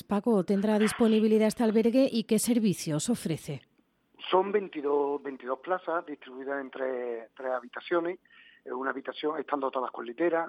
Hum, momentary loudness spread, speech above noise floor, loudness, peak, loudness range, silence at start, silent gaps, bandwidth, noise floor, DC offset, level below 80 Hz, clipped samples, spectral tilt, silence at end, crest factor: none; 12 LU; 40 dB; -29 LUFS; -10 dBFS; 8 LU; 0.1 s; none; 15 kHz; -68 dBFS; under 0.1%; -70 dBFS; under 0.1%; -5.5 dB/octave; 0 s; 18 dB